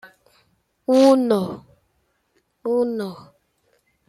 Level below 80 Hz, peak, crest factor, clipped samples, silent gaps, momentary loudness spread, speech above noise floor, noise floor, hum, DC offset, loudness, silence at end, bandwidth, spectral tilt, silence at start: -68 dBFS; -4 dBFS; 20 dB; under 0.1%; none; 18 LU; 50 dB; -68 dBFS; none; under 0.1%; -20 LUFS; 0.9 s; 13.5 kHz; -6 dB/octave; 0.05 s